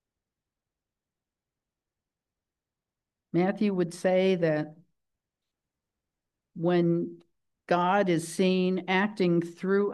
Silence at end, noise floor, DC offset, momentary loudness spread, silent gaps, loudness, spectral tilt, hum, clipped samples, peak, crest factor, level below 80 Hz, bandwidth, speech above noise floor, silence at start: 0 s; -90 dBFS; under 0.1%; 7 LU; none; -27 LUFS; -6.5 dB/octave; none; under 0.1%; -12 dBFS; 18 dB; -78 dBFS; 12.5 kHz; 64 dB; 3.35 s